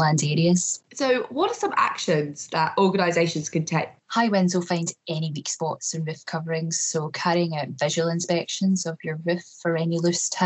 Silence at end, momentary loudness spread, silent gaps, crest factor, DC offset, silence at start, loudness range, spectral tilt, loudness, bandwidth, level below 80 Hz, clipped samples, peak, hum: 0 s; 7 LU; none; 16 dB; under 0.1%; 0 s; 3 LU; -4.5 dB/octave; -24 LUFS; 8.4 kHz; -74 dBFS; under 0.1%; -8 dBFS; none